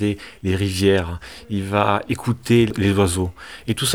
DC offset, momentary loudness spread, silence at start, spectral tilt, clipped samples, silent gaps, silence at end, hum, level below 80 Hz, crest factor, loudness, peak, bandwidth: 0.3%; 11 LU; 0 s; -5.5 dB/octave; under 0.1%; none; 0 s; none; -44 dBFS; 18 dB; -20 LUFS; -2 dBFS; 18 kHz